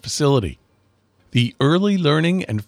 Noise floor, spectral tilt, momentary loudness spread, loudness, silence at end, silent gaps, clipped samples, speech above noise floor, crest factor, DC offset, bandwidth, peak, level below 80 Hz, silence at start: -61 dBFS; -6 dB/octave; 5 LU; -18 LUFS; 0.05 s; none; under 0.1%; 43 dB; 14 dB; under 0.1%; 14.5 kHz; -4 dBFS; -46 dBFS; 0.05 s